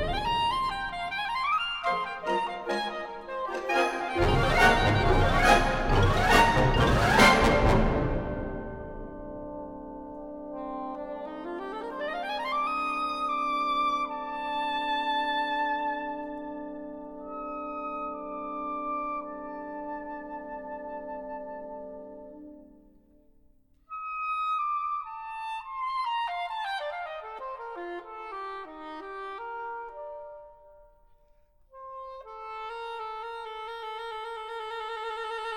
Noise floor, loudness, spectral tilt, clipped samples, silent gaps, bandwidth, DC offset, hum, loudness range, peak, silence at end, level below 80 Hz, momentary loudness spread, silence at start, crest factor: -61 dBFS; -29 LUFS; -5 dB/octave; under 0.1%; none; 16.5 kHz; under 0.1%; none; 18 LU; -6 dBFS; 0 s; -38 dBFS; 19 LU; 0 s; 24 dB